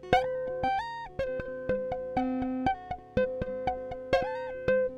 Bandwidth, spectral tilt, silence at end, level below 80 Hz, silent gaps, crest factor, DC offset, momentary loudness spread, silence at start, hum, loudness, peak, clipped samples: 8.8 kHz; -6.5 dB/octave; 0 s; -50 dBFS; none; 20 dB; under 0.1%; 7 LU; 0 s; none; -32 LUFS; -10 dBFS; under 0.1%